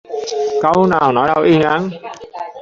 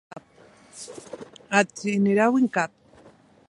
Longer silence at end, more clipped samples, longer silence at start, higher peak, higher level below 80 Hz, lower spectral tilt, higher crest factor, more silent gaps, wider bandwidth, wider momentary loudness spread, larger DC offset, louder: second, 0 s vs 0.8 s; neither; about the same, 0.1 s vs 0.15 s; about the same, -2 dBFS vs -4 dBFS; first, -50 dBFS vs -70 dBFS; about the same, -6.5 dB/octave vs -5.5 dB/octave; second, 14 dB vs 22 dB; neither; second, 7.6 kHz vs 11.5 kHz; second, 17 LU vs 21 LU; neither; first, -14 LUFS vs -23 LUFS